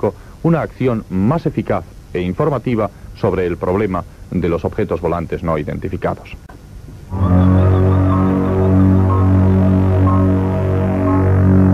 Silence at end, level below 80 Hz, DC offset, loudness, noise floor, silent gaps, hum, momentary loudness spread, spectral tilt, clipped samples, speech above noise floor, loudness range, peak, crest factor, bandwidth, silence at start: 0 s; -34 dBFS; under 0.1%; -16 LUFS; -34 dBFS; none; none; 10 LU; -10 dB/octave; under 0.1%; 17 dB; 7 LU; 0 dBFS; 14 dB; 5.4 kHz; 0 s